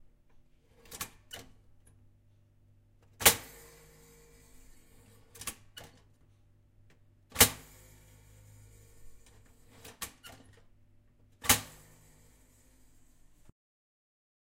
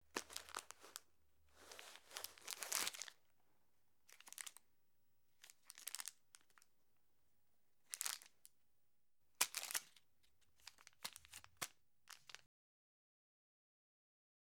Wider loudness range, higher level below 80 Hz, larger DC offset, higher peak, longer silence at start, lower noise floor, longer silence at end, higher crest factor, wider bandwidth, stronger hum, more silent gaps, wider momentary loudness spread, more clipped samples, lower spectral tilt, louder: first, 18 LU vs 9 LU; first, -58 dBFS vs -88 dBFS; neither; first, -6 dBFS vs -14 dBFS; first, 0.9 s vs 0.15 s; second, -64 dBFS vs -88 dBFS; first, 2.85 s vs 2.05 s; second, 34 dB vs 40 dB; second, 16 kHz vs over 20 kHz; neither; neither; first, 29 LU vs 24 LU; neither; first, -1 dB/octave vs 1.5 dB/octave; first, -29 LUFS vs -48 LUFS